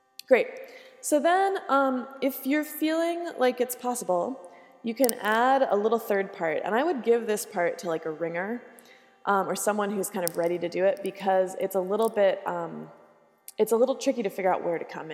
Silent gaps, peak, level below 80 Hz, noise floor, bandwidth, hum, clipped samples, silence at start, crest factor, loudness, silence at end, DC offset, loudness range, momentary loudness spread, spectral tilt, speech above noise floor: none; -2 dBFS; -84 dBFS; -54 dBFS; 17 kHz; none; under 0.1%; 0.3 s; 24 dB; -27 LUFS; 0 s; under 0.1%; 3 LU; 11 LU; -4 dB/octave; 28 dB